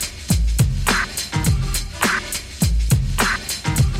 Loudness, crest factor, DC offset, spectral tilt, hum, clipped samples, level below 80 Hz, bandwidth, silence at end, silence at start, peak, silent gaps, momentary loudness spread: -20 LUFS; 16 dB; under 0.1%; -4 dB/octave; none; under 0.1%; -24 dBFS; 17 kHz; 0 s; 0 s; -4 dBFS; none; 4 LU